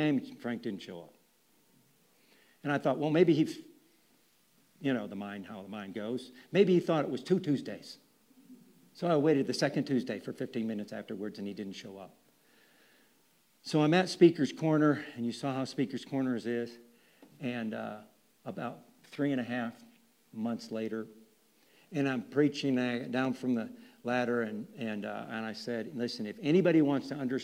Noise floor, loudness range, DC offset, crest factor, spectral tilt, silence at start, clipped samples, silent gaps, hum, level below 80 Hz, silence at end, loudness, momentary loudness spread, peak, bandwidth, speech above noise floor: -69 dBFS; 9 LU; under 0.1%; 22 dB; -6.5 dB/octave; 0 s; under 0.1%; none; none; -84 dBFS; 0 s; -32 LUFS; 17 LU; -10 dBFS; 16 kHz; 38 dB